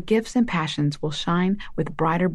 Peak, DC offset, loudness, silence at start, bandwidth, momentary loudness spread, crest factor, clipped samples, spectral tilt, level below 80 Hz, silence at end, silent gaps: -10 dBFS; under 0.1%; -24 LUFS; 0 s; 12 kHz; 5 LU; 12 dB; under 0.1%; -6.5 dB/octave; -44 dBFS; 0 s; none